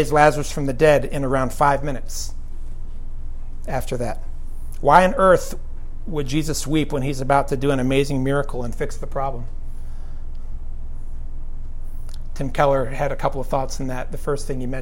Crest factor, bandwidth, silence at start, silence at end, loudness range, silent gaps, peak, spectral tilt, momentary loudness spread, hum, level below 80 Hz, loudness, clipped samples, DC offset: 20 dB; 16 kHz; 0 s; 0 s; 11 LU; none; 0 dBFS; -5.5 dB/octave; 21 LU; none; -26 dBFS; -21 LUFS; under 0.1%; under 0.1%